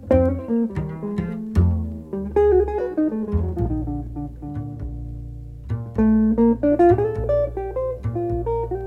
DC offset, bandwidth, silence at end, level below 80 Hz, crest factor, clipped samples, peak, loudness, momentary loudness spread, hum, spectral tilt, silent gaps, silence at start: under 0.1%; 5.6 kHz; 0 s; -32 dBFS; 16 dB; under 0.1%; -4 dBFS; -22 LUFS; 15 LU; none; -11 dB/octave; none; 0 s